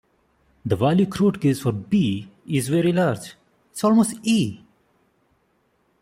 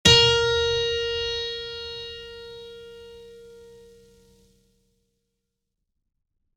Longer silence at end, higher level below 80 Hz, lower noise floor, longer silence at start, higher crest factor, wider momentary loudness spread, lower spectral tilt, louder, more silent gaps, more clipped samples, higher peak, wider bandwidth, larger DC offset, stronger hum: second, 1.45 s vs 2.9 s; second, -58 dBFS vs -48 dBFS; second, -66 dBFS vs -80 dBFS; first, 0.65 s vs 0.05 s; second, 18 dB vs 24 dB; second, 12 LU vs 27 LU; first, -6.5 dB/octave vs -2.5 dB/octave; about the same, -21 LUFS vs -22 LUFS; neither; neither; second, -6 dBFS vs -2 dBFS; first, 16 kHz vs 14 kHz; neither; neither